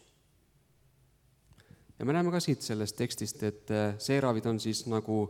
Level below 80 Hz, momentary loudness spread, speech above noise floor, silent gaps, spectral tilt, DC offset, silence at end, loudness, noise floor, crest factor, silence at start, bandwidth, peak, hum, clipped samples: -68 dBFS; 6 LU; 36 dB; none; -5.5 dB/octave; under 0.1%; 0 s; -32 LUFS; -67 dBFS; 20 dB; 2 s; 17 kHz; -14 dBFS; none; under 0.1%